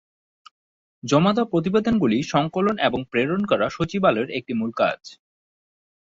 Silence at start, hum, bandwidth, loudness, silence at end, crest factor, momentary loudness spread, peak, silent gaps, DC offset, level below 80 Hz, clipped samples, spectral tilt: 1.05 s; none; 7.8 kHz; -22 LUFS; 1 s; 18 dB; 6 LU; -4 dBFS; none; under 0.1%; -54 dBFS; under 0.1%; -6 dB/octave